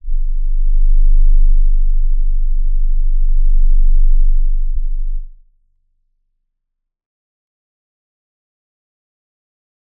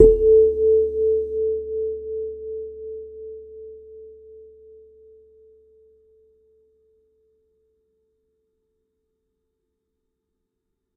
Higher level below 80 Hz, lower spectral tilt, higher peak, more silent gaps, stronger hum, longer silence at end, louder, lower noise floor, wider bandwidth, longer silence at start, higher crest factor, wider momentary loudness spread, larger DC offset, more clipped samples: first, -12 dBFS vs -40 dBFS; first, -15 dB/octave vs -11 dB/octave; about the same, -2 dBFS vs 0 dBFS; neither; neither; second, 4.7 s vs 6.55 s; about the same, -20 LUFS vs -20 LUFS; about the same, -75 dBFS vs -78 dBFS; second, 0.1 kHz vs 1 kHz; about the same, 0.05 s vs 0 s; second, 10 dB vs 24 dB; second, 8 LU vs 26 LU; neither; neither